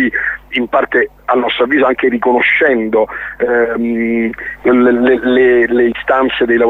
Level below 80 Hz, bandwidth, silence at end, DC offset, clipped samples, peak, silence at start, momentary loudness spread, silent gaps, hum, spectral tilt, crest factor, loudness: -42 dBFS; 4.1 kHz; 0 s; under 0.1%; under 0.1%; -2 dBFS; 0 s; 7 LU; none; none; -7 dB/octave; 12 dB; -12 LUFS